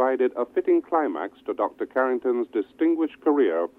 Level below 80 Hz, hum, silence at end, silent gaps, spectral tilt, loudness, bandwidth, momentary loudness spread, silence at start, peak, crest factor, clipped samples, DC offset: -72 dBFS; none; 0.1 s; none; -7 dB/octave; -24 LUFS; 3.9 kHz; 6 LU; 0 s; -10 dBFS; 14 dB; under 0.1%; under 0.1%